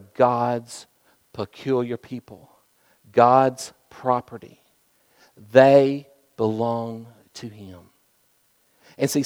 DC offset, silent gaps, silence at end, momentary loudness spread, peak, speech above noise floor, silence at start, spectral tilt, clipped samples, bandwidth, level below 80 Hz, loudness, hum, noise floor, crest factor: under 0.1%; none; 0 s; 24 LU; 0 dBFS; 43 dB; 0.2 s; -6 dB/octave; under 0.1%; 18 kHz; -70 dBFS; -21 LUFS; none; -64 dBFS; 24 dB